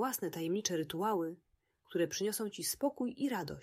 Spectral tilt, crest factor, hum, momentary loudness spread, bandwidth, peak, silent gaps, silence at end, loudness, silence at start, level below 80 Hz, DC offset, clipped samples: -4 dB/octave; 20 dB; none; 3 LU; 16 kHz; -18 dBFS; none; 0 s; -36 LUFS; 0 s; -72 dBFS; under 0.1%; under 0.1%